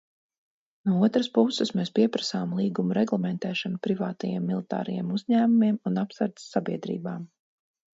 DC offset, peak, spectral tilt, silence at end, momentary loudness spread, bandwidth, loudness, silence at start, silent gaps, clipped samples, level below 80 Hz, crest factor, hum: under 0.1%; -8 dBFS; -6.5 dB/octave; 0.7 s; 9 LU; 7.8 kHz; -27 LUFS; 0.85 s; none; under 0.1%; -72 dBFS; 20 dB; none